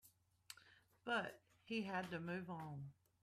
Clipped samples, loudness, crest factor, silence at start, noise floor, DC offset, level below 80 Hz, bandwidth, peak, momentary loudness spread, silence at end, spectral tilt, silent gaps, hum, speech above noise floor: under 0.1%; -47 LUFS; 18 dB; 0.05 s; -70 dBFS; under 0.1%; -84 dBFS; 15 kHz; -30 dBFS; 16 LU; 0.3 s; -5.5 dB/octave; none; none; 24 dB